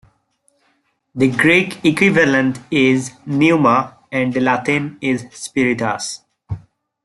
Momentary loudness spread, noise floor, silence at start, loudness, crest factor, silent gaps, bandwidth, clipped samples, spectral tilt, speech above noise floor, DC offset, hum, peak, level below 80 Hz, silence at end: 16 LU; -64 dBFS; 1.15 s; -16 LUFS; 16 dB; none; 12 kHz; under 0.1%; -5.5 dB/octave; 48 dB; under 0.1%; none; 0 dBFS; -54 dBFS; 0.45 s